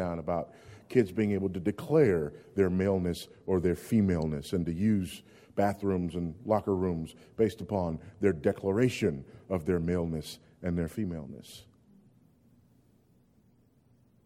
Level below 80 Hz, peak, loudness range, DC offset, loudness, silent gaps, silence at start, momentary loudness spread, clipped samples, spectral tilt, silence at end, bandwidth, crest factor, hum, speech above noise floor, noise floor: -54 dBFS; -12 dBFS; 10 LU; under 0.1%; -30 LUFS; none; 0 s; 12 LU; under 0.1%; -7.5 dB/octave; 2.65 s; 16 kHz; 20 dB; none; 35 dB; -65 dBFS